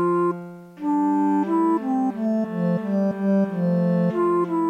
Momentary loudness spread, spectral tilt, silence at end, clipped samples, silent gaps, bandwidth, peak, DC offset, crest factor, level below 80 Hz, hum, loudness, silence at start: 4 LU; -10 dB/octave; 0 s; under 0.1%; none; 9 kHz; -12 dBFS; under 0.1%; 10 dB; -72 dBFS; none; -22 LUFS; 0 s